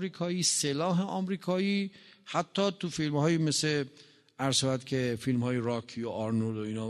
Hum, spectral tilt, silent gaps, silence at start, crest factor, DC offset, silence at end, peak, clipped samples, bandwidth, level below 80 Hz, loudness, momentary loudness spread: none; -4.5 dB/octave; none; 0 s; 16 dB; under 0.1%; 0 s; -14 dBFS; under 0.1%; 12.5 kHz; -68 dBFS; -30 LUFS; 8 LU